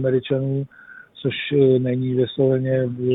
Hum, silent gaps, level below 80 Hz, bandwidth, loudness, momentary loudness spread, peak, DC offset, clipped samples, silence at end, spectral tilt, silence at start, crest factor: none; none; -60 dBFS; 4 kHz; -21 LUFS; 10 LU; -6 dBFS; under 0.1%; under 0.1%; 0 s; -11 dB/octave; 0 s; 14 dB